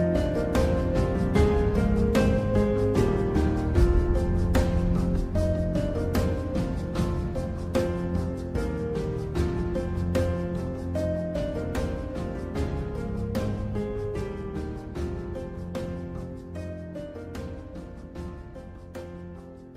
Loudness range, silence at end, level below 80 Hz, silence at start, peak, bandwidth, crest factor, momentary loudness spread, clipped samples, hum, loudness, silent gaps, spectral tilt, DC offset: 12 LU; 0 s; -32 dBFS; 0 s; -10 dBFS; 15 kHz; 16 dB; 15 LU; under 0.1%; none; -28 LUFS; none; -8 dB/octave; under 0.1%